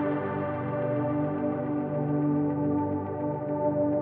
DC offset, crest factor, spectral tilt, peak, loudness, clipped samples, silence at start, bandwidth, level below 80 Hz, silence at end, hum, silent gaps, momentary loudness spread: under 0.1%; 12 dB; -9.5 dB/octave; -16 dBFS; -29 LUFS; under 0.1%; 0 s; 3.5 kHz; -62 dBFS; 0 s; none; none; 4 LU